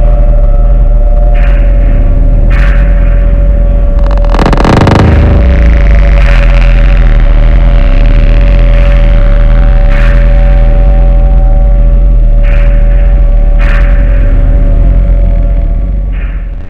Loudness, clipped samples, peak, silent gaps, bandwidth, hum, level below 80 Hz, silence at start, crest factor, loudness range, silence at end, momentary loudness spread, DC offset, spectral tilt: -8 LUFS; 5%; 0 dBFS; none; 5 kHz; none; -4 dBFS; 0 s; 4 dB; 3 LU; 0 s; 3 LU; under 0.1%; -8 dB/octave